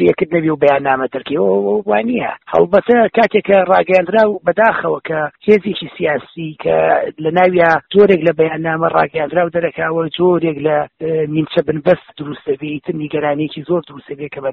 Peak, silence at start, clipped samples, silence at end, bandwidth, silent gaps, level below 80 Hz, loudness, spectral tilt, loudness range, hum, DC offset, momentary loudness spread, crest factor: 0 dBFS; 0 s; under 0.1%; 0 s; 6.2 kHz; none; -52 dBFS; -15 LUFS; -4.5 dB/octave; 5 LU; none; under 0.1%; 10 LU; 14 dB